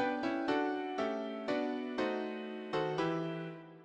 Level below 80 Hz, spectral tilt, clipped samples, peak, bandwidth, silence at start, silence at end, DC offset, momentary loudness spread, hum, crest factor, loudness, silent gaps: -74 dBFS; -6.5 dB/octave; under 0.1%; -20 dBFS; 9.4 kHz; 0 s; 0 s; under 0.1%; 7 LU; none; 16 dB; -36 LUFS; none